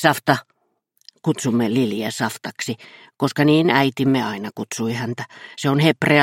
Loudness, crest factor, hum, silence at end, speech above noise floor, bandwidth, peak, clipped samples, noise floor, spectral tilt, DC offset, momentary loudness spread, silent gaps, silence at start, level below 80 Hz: -20 LUFS; 20 dB; none; 0 s; 46 dB; 16.5 kHz; -2 dBFS; under 0.1%; -66 dBFS; -5.5 dB/octave; under 0.1%; 12 LU; none; 0 s; -62 dBFS